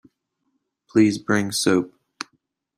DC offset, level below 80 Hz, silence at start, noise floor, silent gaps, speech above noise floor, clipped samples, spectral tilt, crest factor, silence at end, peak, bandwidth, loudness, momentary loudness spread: under 0.1%; -62 dBFS; 0.95 s; -74 dBFS; none; 54 dB; under 0.1%; -4.5 dB/octave; 20 dB; 0.9 s; -4 dBFS; 15.5 kHz; -21 LUFS; 18 LU